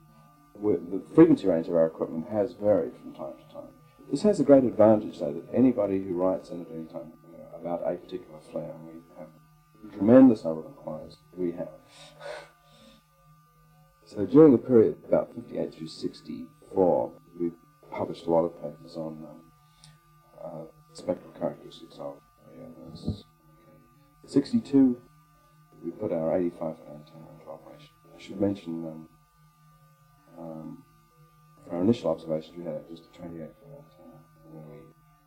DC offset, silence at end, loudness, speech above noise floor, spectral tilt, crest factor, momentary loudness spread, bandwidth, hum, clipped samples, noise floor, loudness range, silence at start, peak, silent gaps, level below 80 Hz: under 0.1%; 0.45 s; -26 LUFS; 34 dB; -8.5 dB/octave; 24 dB; 26 LU; 9.6 kHz; none; under 0.1%; -60 dBFS; 14 LU; 0.6 s; -4 dBFS; none; -62 dBFS